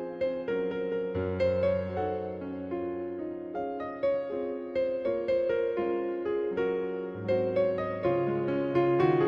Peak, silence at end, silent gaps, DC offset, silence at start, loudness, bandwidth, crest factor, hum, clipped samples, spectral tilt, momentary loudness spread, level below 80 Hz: -14 dBFS; 0 s; none; under 0.1%; 0 s; -30 LUFS; 5.6 kHz; 16 dB; none; under 0.1%; -9 dB/octave; 8 LU; -62 dBFS